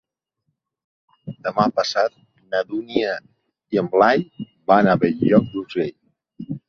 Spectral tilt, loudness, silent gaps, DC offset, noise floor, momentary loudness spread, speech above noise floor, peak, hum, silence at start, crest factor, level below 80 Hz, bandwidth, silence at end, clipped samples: -6.5 dB/octave; -20 LUFS; none; under 0.1%; -75 dBFS; 16 LU; 57 dB; -2 dBFS; none; 1.25 s; 20 dB; -58 dBFS; 7 kHz; 0.1 s; under 0.1%